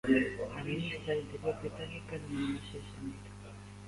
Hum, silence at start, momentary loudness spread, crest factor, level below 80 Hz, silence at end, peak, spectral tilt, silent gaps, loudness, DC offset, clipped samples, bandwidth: 50 Hz at -50 dBFS; 0.05 s; 13 LU; 20 dB; -56 dBFS; 0 s; -16 dBFS; -6.5 dB/octave; none; -37 LUFS; under 0.1%; under 0.1%; 11.5 kHz